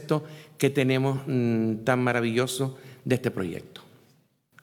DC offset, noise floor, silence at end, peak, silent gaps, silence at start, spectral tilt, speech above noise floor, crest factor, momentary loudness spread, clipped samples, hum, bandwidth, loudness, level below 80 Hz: under 0.1%; -64 dBFS; 0.85 s; -8 dBFS; none; 0 s; -6 dB/octave; 38 dB; 20 dB; 12 LU; under 0.1%; none; 18.5 kHz; -26 LUFS; -70 dBFS